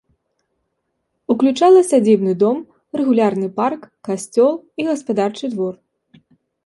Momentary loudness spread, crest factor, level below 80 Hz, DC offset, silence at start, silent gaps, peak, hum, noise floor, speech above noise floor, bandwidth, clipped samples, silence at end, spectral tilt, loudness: 14 LU; 16 dB; -66 dBFS; under 0.1%; 1.3 s; none; -2 dBFS; none; -72 dBFS; 57 dB; 11.5 kHz; under 0.1%; 0.9 s; -6 dB/octave; -17 LUFS